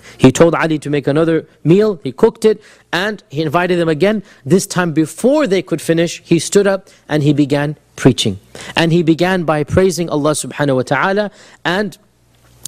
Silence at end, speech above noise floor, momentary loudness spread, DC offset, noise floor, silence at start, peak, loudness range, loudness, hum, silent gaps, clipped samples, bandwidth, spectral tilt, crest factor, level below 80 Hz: 0.7 s; 37 dB; 8 LU; under 0.1%; -51 dBFS; 0.05 s; 0 dBFS; 1 LU; -15 LUFS; none; none; 0.1%; 15.5 kHz; -5.5 dB/octave; 14 dB; -46 dBFS